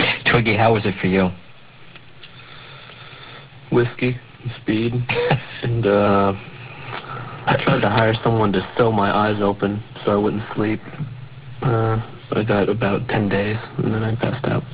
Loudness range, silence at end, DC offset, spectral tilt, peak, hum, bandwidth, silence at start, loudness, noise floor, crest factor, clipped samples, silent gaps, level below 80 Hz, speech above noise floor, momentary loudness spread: 6 LU; 0 s; 0.3%; -10.5 dB/octave; 0 dBFS; none; 4 kHz; 0 s; -20 LUFS; -45 dBFS; 20 dB; under 0.1%; none; -44 dBFS; 26 dB; 21 LU